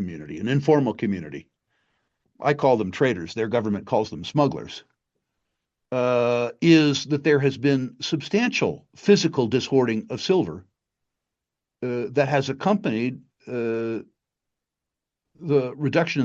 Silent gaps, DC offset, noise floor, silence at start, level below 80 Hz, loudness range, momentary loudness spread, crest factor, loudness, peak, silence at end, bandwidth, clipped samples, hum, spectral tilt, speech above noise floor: none; under 0.1%; -86 dBFS; 0 s; -66 dBFS; 6 LU; 12 LU; 20 dB; -23 LUFS; -4 dBFS; 0 s; 7.8 kHz; under 0.1%; none; -6 dB/octave; 64 dB